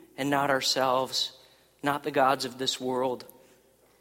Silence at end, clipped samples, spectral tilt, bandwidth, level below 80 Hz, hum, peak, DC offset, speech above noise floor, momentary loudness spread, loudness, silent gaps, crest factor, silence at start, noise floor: 0.75 s; under 0.1%; -3 dB/octave; 16.5 kHz; -72 dBFS; none; -10 dBFS; under 0.1%; 34 dB; 8 LU; -27 LUFS; none; 20 dB; 0.2 s; -61 dBFS